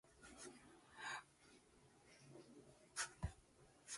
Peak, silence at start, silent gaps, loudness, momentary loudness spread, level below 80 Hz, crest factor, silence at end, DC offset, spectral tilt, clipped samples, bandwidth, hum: -30 dBFS; 0.05 s; none; -53 LUFS; 20 LU; -66 dBFS; 26 dB; 0 s; under 0.1%; -2.5 dB/octave; under 0.1%; 11.5 kHz; none